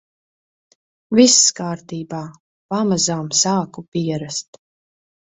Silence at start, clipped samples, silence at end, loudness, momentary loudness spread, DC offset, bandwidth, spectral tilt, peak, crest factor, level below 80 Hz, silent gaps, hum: 1.1 s; under 0.1%; 0.9 s; -17 LUFS; 17 LU; under 0.1%; 8.4 kHz; -3 dB/octave; 0 dBFS; 20 dB; -60 dBFS; 2.40-2.69 s, 3.88-3.92 s; none